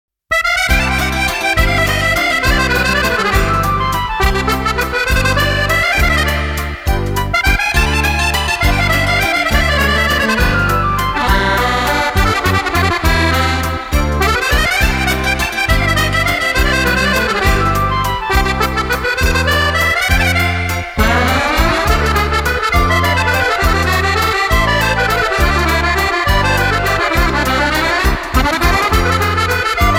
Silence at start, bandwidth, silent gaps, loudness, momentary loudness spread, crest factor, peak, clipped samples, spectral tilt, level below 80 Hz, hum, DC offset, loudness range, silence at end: 0.3 s; 16.5 kHz; none; -13 LUFS; 3 LU; 14 dB; 0 dBFS; under 0.1%; -4 dB/octave; -20 dBFS; none; under 0.1%; 1 LU; 0 s